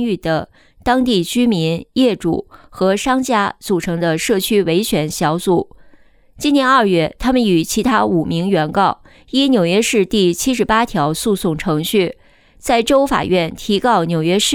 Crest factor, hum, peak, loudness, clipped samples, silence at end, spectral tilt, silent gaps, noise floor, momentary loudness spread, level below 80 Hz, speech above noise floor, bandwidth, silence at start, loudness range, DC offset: 14 dB; none; -2 dBFS; -16 LUFS; under 0.1%; 0 s; -4.5 dB/octave; none; -46 dBFS; 6 LU; -42 dBFS; 31 dB; 19.5 kHz; 0 s; 2 LU; under 0.1%